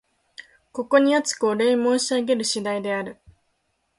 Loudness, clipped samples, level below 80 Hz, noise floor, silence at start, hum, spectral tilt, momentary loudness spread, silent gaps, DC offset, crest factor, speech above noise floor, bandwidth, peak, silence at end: -21 LUFS; under 0.1%; -66 dBFS; -71 dBFS; 0.4 s; none; -3 dB/octave; 12 LU; none; under 0.1%; 20 dB; 50 dB; 11.5 kHz; -4 dBFS; 0.85 s